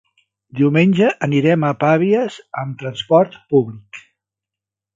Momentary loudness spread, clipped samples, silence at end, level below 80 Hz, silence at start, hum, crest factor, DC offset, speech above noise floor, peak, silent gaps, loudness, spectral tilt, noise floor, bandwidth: 13 LU; under 0.1%; 0.95 s; -62 dBFS; 0.55 s; none; 18 dB; under 0.1%; 71 dB; 0 dBFS; none; -17 LUFS; -7.5 dB/octave; -87 dBFS; 7.6 kHz